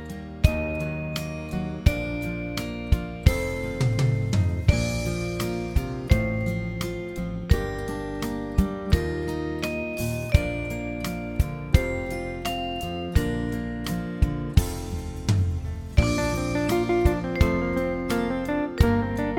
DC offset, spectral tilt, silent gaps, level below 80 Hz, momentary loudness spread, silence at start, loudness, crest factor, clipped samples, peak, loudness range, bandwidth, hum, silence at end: under 0.1%; -6.5 dB/octave; none; -30 dBFS; 8 LU; 0 s; -26 LUFS; 22 dB; under 0.1%; -4 dBFS; 3 LU; 17.5 kHz; none; 0 s